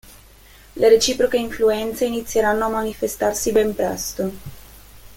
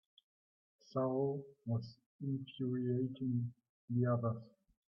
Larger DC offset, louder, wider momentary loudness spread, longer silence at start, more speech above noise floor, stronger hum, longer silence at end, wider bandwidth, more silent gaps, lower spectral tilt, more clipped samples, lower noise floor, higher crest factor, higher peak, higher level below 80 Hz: neither; first, -20 LUFS vs -39 LUFS; about the same, 12 LU vs 10 LU; second, 0.05 s vs 0.95 s; second, 27 dB vs over 52 dB; neither; second, 0 s vs 0.4 s; first, 17 kHz vs 6 kHz; second, none vs 2.06-2.19 s, 3.69-3.88 s; second, -3.5 dB/octave vs -9 dB/octave; neither; second, -47 dBFS vs under -90 dBFS; about the same, 18 dB vs 16 dB; first, -4 dBFS vs -24 dBFS; first, -44 dBFS vs -80 dBFS